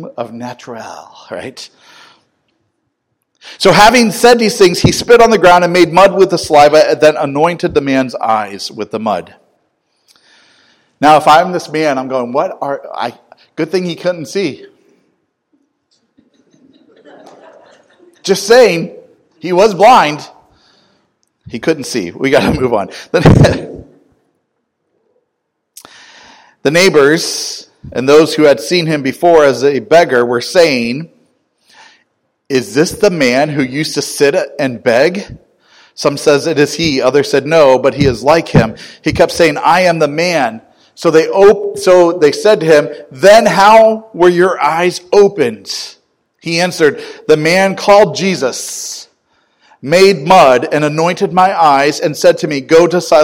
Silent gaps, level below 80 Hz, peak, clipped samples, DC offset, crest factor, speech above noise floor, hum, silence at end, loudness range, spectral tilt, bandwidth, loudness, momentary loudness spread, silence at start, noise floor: none; -38 dBFS; 0 dBFS; 2%; under 0.1%; 12 dB; 60 dB; none; 0 s; 9 LU; -4.5 dB/octave; 19.5 kHz; -10 LUFS; 15 LU; 0 s; -70 dBFS